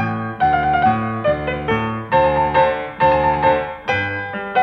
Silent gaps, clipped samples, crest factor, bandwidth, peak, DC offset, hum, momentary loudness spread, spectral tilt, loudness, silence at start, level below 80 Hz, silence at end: none; under 0.1%; 14 dB; 6.2 kHz; -4 dBFS; under 0.1%; none; 6 LU; -7.5 dB/octave; -18 LUFS; 0 s; -38 dBFS; 0 s